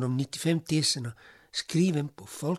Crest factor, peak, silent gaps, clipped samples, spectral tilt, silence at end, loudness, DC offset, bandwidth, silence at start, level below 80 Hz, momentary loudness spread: 16 dB; -12 dBFS; none; under 0.1%; -5 dB/octave; 0 s; -29 LUFS; under 0.1%; 14.5 kHz; 0 s; -68 dBFS; 10 LU